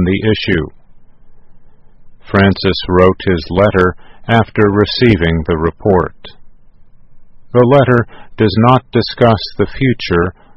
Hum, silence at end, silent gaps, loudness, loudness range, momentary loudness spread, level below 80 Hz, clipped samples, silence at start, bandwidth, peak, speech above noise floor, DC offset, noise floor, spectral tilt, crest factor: none; 0.25 s; none; -12 LUFS; 3 LU; 7 LU; -34 dBFS; 0.2%; 0 s; 6.2 kHz; 0 dBFS; 26 dB; under 0.1%; -38 dBFS; -8.5 dB/octave; 14 dB